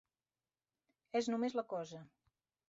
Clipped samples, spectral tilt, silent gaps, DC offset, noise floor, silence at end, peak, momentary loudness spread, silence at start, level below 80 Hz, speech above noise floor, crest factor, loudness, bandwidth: under 0.1%; -4.5 dB/octave; none; under 0.1%; under -90 dBFS; 0.6 s; -24 dBFS; 13 LU; 1.15 s; -84 dBFS; over 51 dB; 18 dB; -40 LUFS; 7.6 kHz